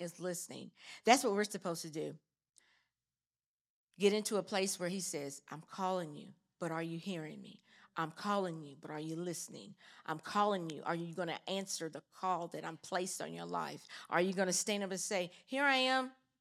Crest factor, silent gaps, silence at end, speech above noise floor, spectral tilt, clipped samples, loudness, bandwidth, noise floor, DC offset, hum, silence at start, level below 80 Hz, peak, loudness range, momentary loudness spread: 28 dB; 3.46-3.87 s; 0.25 s; over 52 dB; -3.5 dB/octave; under 0.1%; -37 LUFS; 16 kHz; under -90 dBFS; under 0.1%; none; 0 s; under -90 dBFS; -12 dBFS; 6 LU; 16 LU